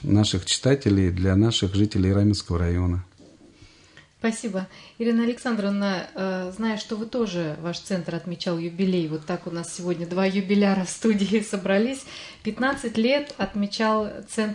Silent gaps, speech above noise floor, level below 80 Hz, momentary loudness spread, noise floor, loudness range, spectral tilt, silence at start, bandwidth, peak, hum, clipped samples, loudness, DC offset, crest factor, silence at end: none; 29 dB; -52 dBFS; 9 LU; -53 dBFS; 5 LU; -5.5 dB/octave; 0 s; 11 kHz; -6 dBFS; none; under 0.1%; -24 LUFS; under 0.1%; 18 dB; 0 s